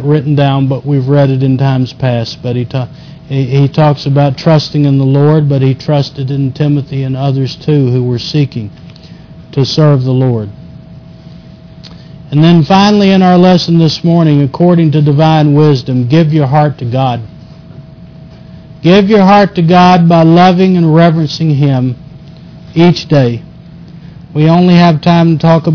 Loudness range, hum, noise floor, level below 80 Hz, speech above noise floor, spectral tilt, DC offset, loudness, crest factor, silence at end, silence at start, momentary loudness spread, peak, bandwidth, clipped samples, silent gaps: 6 LU; none; -32 dBFS; -42 dBFS; 24 dB; -8 dB/octave; under 0.1%; -9 LUFS; 8 dB; 0 s; 0 s; 10 LU; 0 dBFS; 5.4 kHz; 0.3%; none